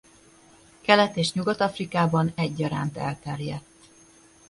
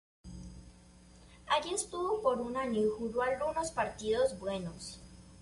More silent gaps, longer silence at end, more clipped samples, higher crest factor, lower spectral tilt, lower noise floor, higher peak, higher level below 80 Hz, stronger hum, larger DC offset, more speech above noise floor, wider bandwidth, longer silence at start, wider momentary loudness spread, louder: neither; first, 0.9 s vs 0 s; neither; first, 24 dB vs 18 dB; first, -5.5 dB/octave vs -4 dB/octave; second, -54 dBFS vs -58 dBFS; first, -2 dBFS vs -16 dBFS; about the same, -58 dBFS vs -58 dBFS; neither; neither; first, 30 dB vs 24 dB; about the same, 11.5 kHz vs 11.5 kHz; first, 0.85 s vs 0.25 s; second, 13 LU vs 20 LU; first, -25 LUFS vs -34 LUFS